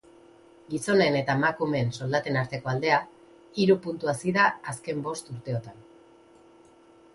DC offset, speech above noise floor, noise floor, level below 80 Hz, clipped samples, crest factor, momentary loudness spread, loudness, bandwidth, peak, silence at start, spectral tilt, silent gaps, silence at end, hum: under 0.1%; 29 dB; -55 dBFS; -64 dBFS; under 0.1%; 20 dB; 12 LU; -26 LUFS; 11.5 kHz; -8 dBFS; 0.7 s; -5.5 dB/octave; none; 1.35 s; none